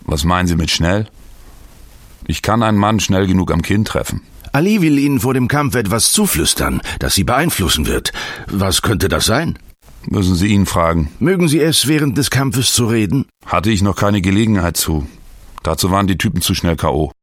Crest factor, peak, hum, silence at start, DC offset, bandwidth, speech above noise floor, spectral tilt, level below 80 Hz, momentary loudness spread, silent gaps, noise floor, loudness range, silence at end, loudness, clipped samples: 16 dB; 0 dBFS; none; 0.1 s; under 0.1%; 17 kHz; 25 dB; -4.5 dB/octave; -30 dBFS; 8 LU; none; -39 dBFS; 3 LU; 0.1 s; -15 LUFS; under 0.1%